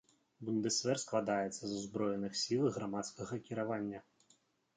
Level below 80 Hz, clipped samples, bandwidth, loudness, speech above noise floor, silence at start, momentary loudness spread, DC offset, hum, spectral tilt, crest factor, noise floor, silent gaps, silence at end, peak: -76 dBFS; under 0.1%; 9.4 kHz; -37 LUFS; 35 dB; 0.4 s; 9 LU; under 0.1%; none; -4 dB/octave; 18 dB; -73 dBFS; none; 0.75 s; -20 dBFS